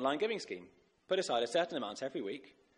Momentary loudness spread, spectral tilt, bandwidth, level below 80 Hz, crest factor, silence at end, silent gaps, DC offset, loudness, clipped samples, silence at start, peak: 12 LU; -3.5 dB/octave; 11 kHz; -80 dBFS; 18 dB; 0.3 s; none; under 0.1%; -36 LUFS; under 0.1%; 0 s; -18 dBFS